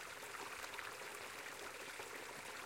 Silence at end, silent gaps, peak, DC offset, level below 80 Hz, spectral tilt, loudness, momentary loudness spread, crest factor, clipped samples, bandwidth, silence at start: 0 s; none; -30 dBFS; under 0.1%; -80 dBFS; -1 dB/octave; -48 LUFS; 2 LU; 20 dB; under 0.1%; 16.5 kHz; 0 s